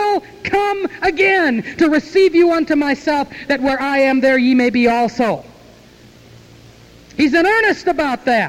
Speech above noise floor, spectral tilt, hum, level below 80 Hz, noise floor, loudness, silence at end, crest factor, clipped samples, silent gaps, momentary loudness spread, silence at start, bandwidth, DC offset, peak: 29 dB; -5 dB/octave; none; -48 dBFS; -44 dBFS; -15 LUFS; 0 s; 12 dB; under 0.1%; none; 7 LU; 0 s; 15.5 kHz; under 0.1%; -4 dBFS